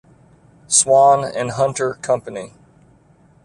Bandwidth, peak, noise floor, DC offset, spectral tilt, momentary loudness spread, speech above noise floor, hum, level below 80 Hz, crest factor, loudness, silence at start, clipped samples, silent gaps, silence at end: 11.5 kHz; 0 dBFS; -52 dBFS; under 0.1%; -3 dB/octave; 20 LU; 36 dB; none; -58 dBFS; 18 dB; -16 LUFS; 0.7 s; under 0.1%; none; 0.95 s